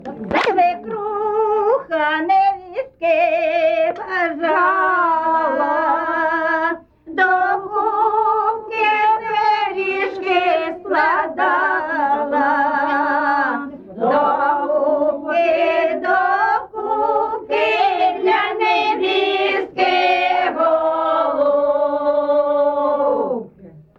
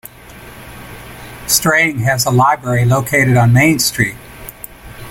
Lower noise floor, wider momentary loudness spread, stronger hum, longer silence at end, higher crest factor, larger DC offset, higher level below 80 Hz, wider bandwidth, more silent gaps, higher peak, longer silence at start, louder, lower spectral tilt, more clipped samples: first, -43 dBFS vs -36 dBFS; second, 5 LU vs 22 LU; neither; first, 0.15 s vs 0 s; about the same, 12 dB vs 14 dB; neither; second, -58 dBFS vs -40 dBFS; second, 7.2 kHz vs 17 kHz; neither; second, -6 dBFS vs 0 dBFS; about the same, 0 s vs 0.05 s; second, -17 LUFS vs -12 LUFS; about the same, -5 dB/octave vs -4.5 dB/octave; neither